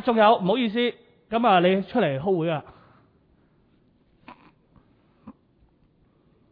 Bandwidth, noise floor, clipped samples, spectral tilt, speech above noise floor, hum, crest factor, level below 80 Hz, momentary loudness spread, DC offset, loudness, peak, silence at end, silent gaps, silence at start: 5 kHz; -62 dBFS; under 0.1%; -9.5 dB/octave; 41 dB; none; 20 dB; -64 dBFS; 10 LU; under 0.1%; -22 LUFS; -6 dBFS; 1.2 s; none; 0 s